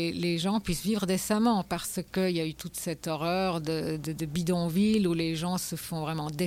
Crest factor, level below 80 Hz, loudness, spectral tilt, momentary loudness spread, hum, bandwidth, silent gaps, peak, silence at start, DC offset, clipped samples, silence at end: 14 dB; -52 dBFS; -29 LUFS; -5 dB/octave; 8 LU; none; 16.5 kHz; none; -16 dBFS; 0 s; under 0.1%; under 0.1%; 0 s